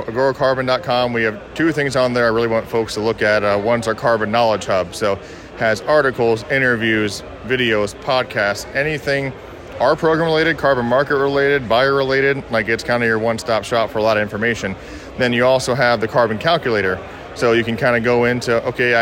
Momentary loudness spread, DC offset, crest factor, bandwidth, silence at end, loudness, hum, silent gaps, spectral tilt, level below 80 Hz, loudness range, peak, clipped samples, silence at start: 6 LU; under 0.1%; 14 dB; 16.5 kHz; 0 s; -17 LUFS; none; none; -5 dB/octave; -46 dBFS; 2 LU; -4 dBFS; under 0.1%; 0 s